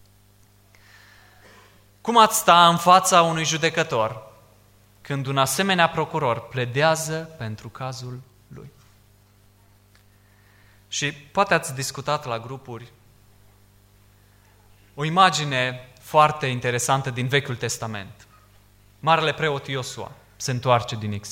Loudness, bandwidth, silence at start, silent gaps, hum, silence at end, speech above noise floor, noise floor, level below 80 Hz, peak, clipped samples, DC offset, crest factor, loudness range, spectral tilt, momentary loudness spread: -21 LUFS; 16.5 kHz; 2.05 s; none; 50 Hz at -55 dBFS; 0 s; 34 dB; -56 dBFS; -60 dBFS; -2 dBFS; under 0.1%; under 0.1%; 22 dB; 14 LU; -3.5 dB/octave; 18 LU